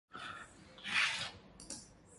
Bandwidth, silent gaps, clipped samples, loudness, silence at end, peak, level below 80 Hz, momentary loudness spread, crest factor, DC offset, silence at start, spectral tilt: 11.5 kHz; none; under 0.1%; -38 LUFS; 0 s; -20 dBFS; -68 dBFS; 20 LU; 22 dB; under 0.1%; 0.1 s; -0.5 dB/octave